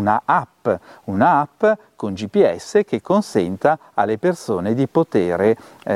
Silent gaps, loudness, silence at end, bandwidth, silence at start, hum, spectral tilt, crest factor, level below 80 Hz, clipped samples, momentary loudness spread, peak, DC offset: none; -19 LUFS; 0 s; 13 kHz; 0 s; none; -7 dB/octave; 18 dB; -58 dBFS; under 0.1%; 7 LU; -2 dBFS; under 0.1%